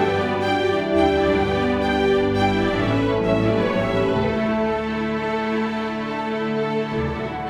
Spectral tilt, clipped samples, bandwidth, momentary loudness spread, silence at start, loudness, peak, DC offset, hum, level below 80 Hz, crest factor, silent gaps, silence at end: -7 dB/octave; under 0.1%; 11.5 kHz; 6 LU; 0 s; -21 LUFS; -6 dBFS; under 0.1%; none; -40 dBFS; 16 dB; none; 0 s